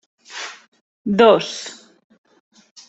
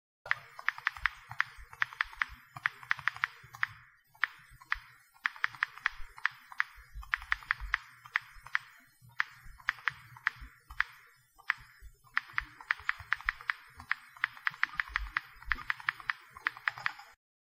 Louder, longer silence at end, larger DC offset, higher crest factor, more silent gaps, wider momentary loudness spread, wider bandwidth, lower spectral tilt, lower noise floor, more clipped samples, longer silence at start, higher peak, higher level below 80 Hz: first, -16 LUFS vs -36 LUFS; first, 1.15 s vs 0.4 s; neither; second, 20 dB vs 30 dB; first, 0.68-0.72 s, 0.81-1.05 s vs none; first, 21 LU vs 5 LU; second, 8.2 kHz vs 16.5 kHz; first, -4.5 dB/octave vs -1.5 dB/octave; second, -35 dBFS vs -62 dBFS; neither; about the same, 0.3 s vs 0.25 s; first, -2 dBFS vs -8 dBFS; second, -64 dBFS vs -56 dBFS